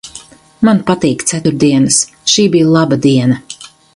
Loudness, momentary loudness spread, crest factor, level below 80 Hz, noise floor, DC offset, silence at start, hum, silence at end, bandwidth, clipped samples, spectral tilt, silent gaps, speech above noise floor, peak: -11 LUFS; 9 LU; 12 dB; -48 dBFS; -36 dBFS; under 0.1%; 0.05 s; none; 0.3 s; 11.5 kHz; under 0.1%; -4.5 dB/octave; none; 26 dB; 0 dBFS